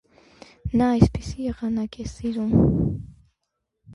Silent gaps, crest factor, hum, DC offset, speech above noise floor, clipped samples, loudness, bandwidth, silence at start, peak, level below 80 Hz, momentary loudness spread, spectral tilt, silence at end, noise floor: none; 22 dB; none; under 0.1%; 57 dB; under 0.1%; -23 LUFS; 11 kHz; 0.65 s; -2 dBFS; -36 dBFS; 12 LU; -8 dB/octave; 0 s; -79 dBFS